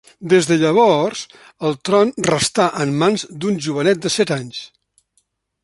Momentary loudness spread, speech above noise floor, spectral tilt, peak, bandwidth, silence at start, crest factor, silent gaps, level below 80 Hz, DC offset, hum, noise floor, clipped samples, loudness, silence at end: 11 LU; 49 dB; -4.5 dB/octave; -2 dBFS; 11.5 kHz; 0.2 s; 16 dB; none; -56 dBFS; under 0.1%; none; -66 dBFS; under 0.1%; -17 LUFS; 0.95 s